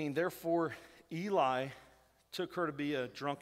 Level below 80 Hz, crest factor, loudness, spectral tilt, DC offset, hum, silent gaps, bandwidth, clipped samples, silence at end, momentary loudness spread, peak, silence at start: -74 dBFS; 18 dB; -37 LUFS; -6 dB/octave; under 0.1%; none; none; 16 kHz; under 0.1%; 0 s; 14 LU; -20 dBFS; 0 s